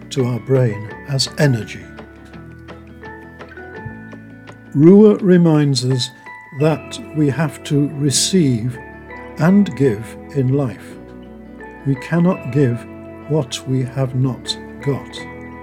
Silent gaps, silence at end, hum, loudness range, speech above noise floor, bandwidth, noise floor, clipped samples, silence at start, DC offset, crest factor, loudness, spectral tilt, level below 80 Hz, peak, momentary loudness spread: none; 0 s; none; 7 LU; 22 dB; 15.5 kHz; -38 dBFS; under 0.1%; 0 s; under 0.1%; 18 dB; -17 LUFS; -6 dB/octave; -48 dBFS; 0 dBFS; 23 LU